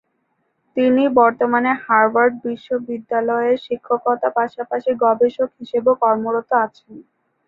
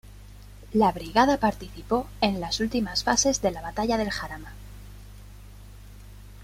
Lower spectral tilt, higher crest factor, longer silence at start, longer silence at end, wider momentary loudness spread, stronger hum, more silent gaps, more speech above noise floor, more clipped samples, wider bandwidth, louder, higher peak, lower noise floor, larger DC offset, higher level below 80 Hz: first, -7.5 dB/octave vs -3.5 dB/octave; second, 16 dB vs 22 dB; first, 0.75 s vs 0.05 s; first, 0.45 s vs 0 s; second, 10 LU vs 23 LU; second, none vs 50 Hz at -40 dBFS; neither; first, 51 dB vs 20 dB; neither; second, 5.2 kHz vs 16 kHz; first, -18 LUFS vs -25 LUFS; first, -2 dBFS vs -6 dBFS; first, -68 dBFS vs -45 dBFS; neither; second, -64 dBFS vs -44 dBFS